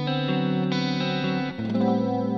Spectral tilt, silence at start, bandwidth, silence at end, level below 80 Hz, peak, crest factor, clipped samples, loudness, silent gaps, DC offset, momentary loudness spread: -7 dB/octave; 0 s; 7.2 kHz; 0 s; -64 dBFS; -12 dBFS; 12 dB; under 0.1%; -25 LUFS; none; 0.1%; 4 LU